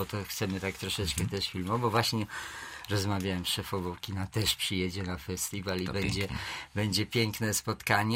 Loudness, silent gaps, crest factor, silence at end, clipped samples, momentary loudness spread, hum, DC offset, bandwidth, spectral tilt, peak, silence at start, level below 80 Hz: -32 LUFS; none; 24 dB; 0 s; under 0.1%; 8 LU; none; under 0.1%; 16 kHz; -4 dB/octave; -8 dBFS; 0 s; -52 dBFS